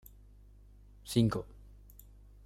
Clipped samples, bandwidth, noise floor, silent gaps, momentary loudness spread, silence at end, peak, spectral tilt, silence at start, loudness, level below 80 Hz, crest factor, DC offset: under 0.1%; 16 kHz; -57 dBFS; none; 27 LU; 0.85 s; -14 dBFS; -6.5 dB/octave; 1.05 s; -32 LUFS; -54 dBFS; 22 dB; under 0.1%